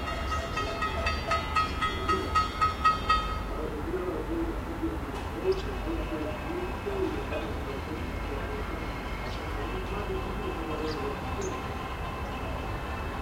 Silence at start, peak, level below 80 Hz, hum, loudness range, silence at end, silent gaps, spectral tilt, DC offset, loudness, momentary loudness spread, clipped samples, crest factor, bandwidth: 0 s; -12 dBFS; -38 dBFS; none; 6 LU; 0 s; none; -5.5 dB/octave; under 0.1%; -31 LUFS; 8 LU; under 0.1%; 20 dB; 16 kHz